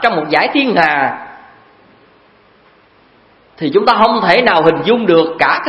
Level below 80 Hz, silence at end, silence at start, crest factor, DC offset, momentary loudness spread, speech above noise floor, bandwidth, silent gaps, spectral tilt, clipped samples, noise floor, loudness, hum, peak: -52 dBFS; 0 s; 0 s; 14 dB; under 0.1%; 6 LU; 37 dB; 8.8 kHz; none; -6.5 dB/octave; 0.1%; -48 dBFS; -12 LUFS; none; 0 dBFS